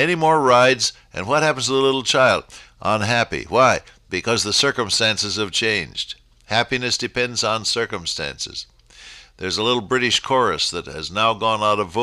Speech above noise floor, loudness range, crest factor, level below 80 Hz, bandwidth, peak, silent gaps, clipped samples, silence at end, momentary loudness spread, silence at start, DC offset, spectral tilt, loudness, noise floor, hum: 24 dB; 5 LU; 16 dB; -50 dBFS; 14 kHz; -4 dBFS; none; under 0.1%; 0 s; 11 LU; 0 s; under 0.1%; -3 dB/octave; -19 LUFS; -44 dBFS; none